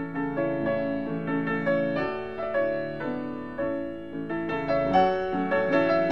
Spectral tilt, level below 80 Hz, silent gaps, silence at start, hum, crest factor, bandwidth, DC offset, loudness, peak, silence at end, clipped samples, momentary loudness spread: -8 dB/octave; -54 dBFS; none; 0 s; none; 18 dB; 6.6 kHz; 0.5%; -27 LUFS; -10 dBFS; 0 s; under 0.1%; 10 LU